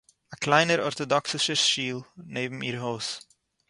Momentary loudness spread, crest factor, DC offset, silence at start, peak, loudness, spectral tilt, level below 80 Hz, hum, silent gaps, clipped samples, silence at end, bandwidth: 12 LU; 24 dB; under 0.1%; 0.3 s; -4 dBFS; -25 LUFS; -3 dB/octave; -68 dBFS; none; none; under 0.1%; 0.5 s; 11.5 kHz